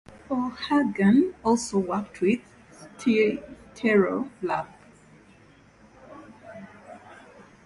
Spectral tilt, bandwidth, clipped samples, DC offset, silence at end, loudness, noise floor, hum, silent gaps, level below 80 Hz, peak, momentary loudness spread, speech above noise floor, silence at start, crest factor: -6 dB/octave; 11.5 kHz; under 0.1%; under 0.1%; 0.5 s; -25 LUFS; -55 dBFS; none; none; -60 dBFS; -10 dBFS; 24 LU; 31 dB; 0.3 s; 18 dB